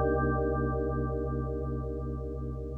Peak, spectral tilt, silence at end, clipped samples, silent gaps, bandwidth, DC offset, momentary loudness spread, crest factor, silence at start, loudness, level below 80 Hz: -16 dBFS; -11.5 dB/octave; 0 s; under 0.1%; none; 1.7 kHz; under 0.1%; 8 LU; 14 dB; 0 s; -32 LUFS; -36 dBFS